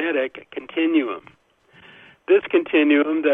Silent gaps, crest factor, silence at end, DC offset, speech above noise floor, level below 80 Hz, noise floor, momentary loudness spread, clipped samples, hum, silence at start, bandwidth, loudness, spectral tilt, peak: none; 16 dB; 0 s; under 0.1%; 33 dB; -70 dBFS; -53 dBFS; 17 LU; under 0.1%; none; 0 s; 3.8 kHz; -20 LUFS; -6.5 dB/octave; -6 dBFS